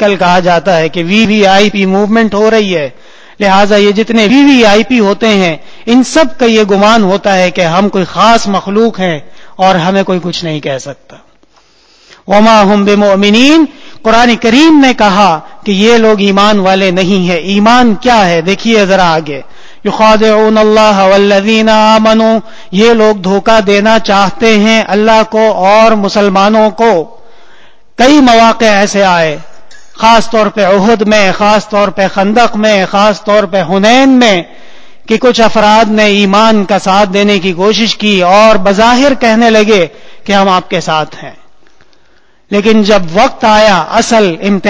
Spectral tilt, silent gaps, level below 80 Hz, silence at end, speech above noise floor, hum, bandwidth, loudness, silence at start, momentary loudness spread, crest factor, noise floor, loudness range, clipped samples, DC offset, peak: -5 dB/octave; none; -38 dBFS; 0 s; 42 dB; none; 8 kHz; -7 LUFS; 0 s; 7 LU; 8 dB; -49 dBFS; 4 LU; 2%; under 0.1%; 0 dBFS